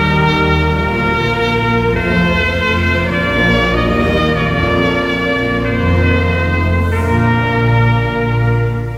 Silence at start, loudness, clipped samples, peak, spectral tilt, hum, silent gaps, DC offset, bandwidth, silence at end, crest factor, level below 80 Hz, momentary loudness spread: 0 s; -14 LUFS; under 0.1%; -2 dBFS; -7 dB/octave; none; none; under 0.1%; 13 kHz; 0 s; 12 dB; -24 dBFS; 3 LU